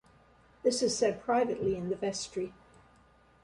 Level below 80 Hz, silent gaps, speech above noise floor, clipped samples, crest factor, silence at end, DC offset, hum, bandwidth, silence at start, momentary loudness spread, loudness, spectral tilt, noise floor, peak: -62 dBFS; none; 32 dB; under 0.1%; 18 dB; 0.9 s; under 0.1%; none; 11.5 kHz; 0.65 s; 9 LU; -31 LUFS; -4 dB/octave; -62 dBFS; -14 dBFS